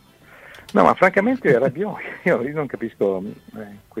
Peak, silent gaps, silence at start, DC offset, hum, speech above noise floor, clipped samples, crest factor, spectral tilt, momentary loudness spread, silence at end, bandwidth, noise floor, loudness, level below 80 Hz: 0 dBFS; none; 0.45 s; under 0.1%; none; 27 dB; under 0.1%; 20 dB; -7.5 dB/octave; 19 LU; 0 s; 15 kHz; -47 dBFS; -20 LUFS; -58 dBFS